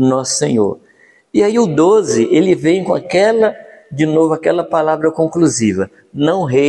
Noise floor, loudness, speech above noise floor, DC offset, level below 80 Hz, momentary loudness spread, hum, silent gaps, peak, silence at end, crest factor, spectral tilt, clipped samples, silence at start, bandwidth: -50 dBFS; -14 LUFS; 37 dB; under 0.1%; -56 dBFS; 7 LU; none; none; 0 dBFS; 0 s; 14 dB; -5.5 dB/octave; under 0.1%; 0 s; 11.5 kHz